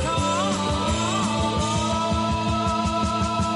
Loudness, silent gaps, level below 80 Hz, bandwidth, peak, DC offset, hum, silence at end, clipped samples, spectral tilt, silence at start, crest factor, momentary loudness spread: -23 LUFS; none; -36 dBFS; 11.5 kHz; -14 dBFS; under 0.1%; none; 0 s; under 0.1%; -4.5 dB/octave; 0 s; 10 dB; 1 LU